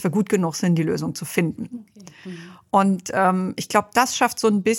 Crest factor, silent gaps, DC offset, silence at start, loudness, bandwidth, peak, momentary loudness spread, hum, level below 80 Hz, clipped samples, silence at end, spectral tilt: 20 dB; none; under 0.1%; 0 s; -21 LUFS; 17 kHz; -2 dBFS; 18 LU; none; -62 dBFS; under 0.1%; 0 s; -5 dB/octave